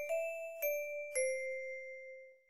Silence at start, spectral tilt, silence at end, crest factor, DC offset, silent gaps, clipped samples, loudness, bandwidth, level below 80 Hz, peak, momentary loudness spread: 0 s; 1.5 dB/octave; 0 s; 16 dB; under 0.1%; none; under 0.1%; -39 LUFS; 16 kHz; -86 dBFS; -24 dBFS; 12 LU